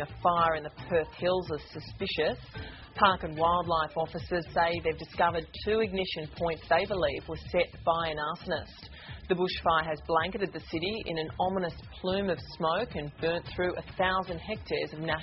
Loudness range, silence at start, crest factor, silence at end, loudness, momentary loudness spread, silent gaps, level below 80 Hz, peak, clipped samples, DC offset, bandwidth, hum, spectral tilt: 3 LU; 0 s; 24 dB; 0 s; -30 LUFS; 10 LU; none; -50 dBFS; -8 dBFS; under 0.1%; under 0.1%; 5.8 kHz; none; -3 dB/octave